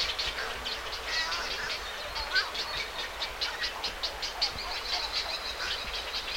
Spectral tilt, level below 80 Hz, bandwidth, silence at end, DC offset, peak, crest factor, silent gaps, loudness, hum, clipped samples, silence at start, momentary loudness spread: -0.5 dB/octave; -50 dBFS; 16.5 kHz; 0 s; under 0.1%; -14 dBFS; 20 dB; none; -31 LUFS; none; under 0.1%; 0 s; 5 LU